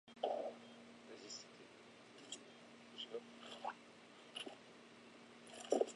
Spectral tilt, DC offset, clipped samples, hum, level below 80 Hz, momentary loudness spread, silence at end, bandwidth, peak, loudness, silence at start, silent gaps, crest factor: -2.5 dB/octave; under 0.1%; under 0.1%; none; under -90 dBFS; 17 LU; 0 s; 11 kHz; -22 dBFS; -50 LUFS; 0.05 s; none; 28 dB